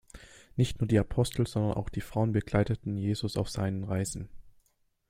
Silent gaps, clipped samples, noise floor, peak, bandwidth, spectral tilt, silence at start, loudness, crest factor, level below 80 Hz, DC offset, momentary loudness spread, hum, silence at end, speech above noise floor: none; under 0.1%; -72 dBFS; -10 dBFS; 15.5 kHz; -6.5 dB/octave; 0.15 s; -31 LUFS; 22 dB; -48 dBFS; under 0.1%; 8 LU; none; 0.6 s; 42 dB